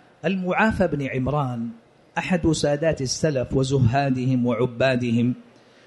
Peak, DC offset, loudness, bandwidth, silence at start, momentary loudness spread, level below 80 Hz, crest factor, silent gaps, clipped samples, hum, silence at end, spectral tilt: -6 dBFS; under 0.1%; -23 LUFS; 11.5 kHz; 0.25 s; 8 LU; -44 dBFS; 16 dB; none; under 0.1%; none; 0.45 s; -6 dB/octave